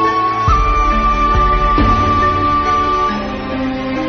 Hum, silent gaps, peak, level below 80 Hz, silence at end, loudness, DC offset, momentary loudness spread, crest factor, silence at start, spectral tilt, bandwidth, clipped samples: none; none; -2 dBFS; -20 dBFS; 0 s; -14 LUFS; under 0.1%; 7 LU; 12 dB; 0 s; -6.5 dB/octave; 6.6 kHz; under 0.1%